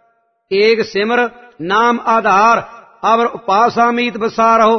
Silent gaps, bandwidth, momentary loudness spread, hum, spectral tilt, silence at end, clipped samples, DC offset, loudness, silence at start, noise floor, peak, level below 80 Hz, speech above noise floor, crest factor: none; 6.4 kHz; 7 LU; none; -4.5 dB/octave; 0 s; under 0.1%; under 0.1%; -13 LUFS; 0.5 s; -59 dBFS; 0 dBFS; -58 dBFS; 46 dB; 12 dB